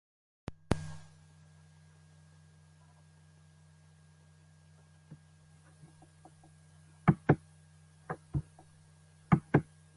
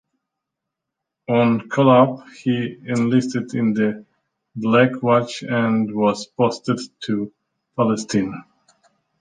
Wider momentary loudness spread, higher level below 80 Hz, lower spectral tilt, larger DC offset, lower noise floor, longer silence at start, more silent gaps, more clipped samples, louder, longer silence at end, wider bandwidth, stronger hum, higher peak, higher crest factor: first, 29 LU vs 11 LU; first, -56 dBFS vs -62 dBFS; first, -8 dB/octave vs -6.5 dB/octave; neither; second, -61 dBFS vs -82 dBFS; second, 0.5 s vs 1.3 s; neither; neither; second, -33 LUFS vs -20 LUFS; second, 0.35 s vs 0.8 s; first, 11.5 kHz vs 9.6 kHz; neither; second, -10 dBFS vs -2 dBFS; first, 28 dB vs 18 dB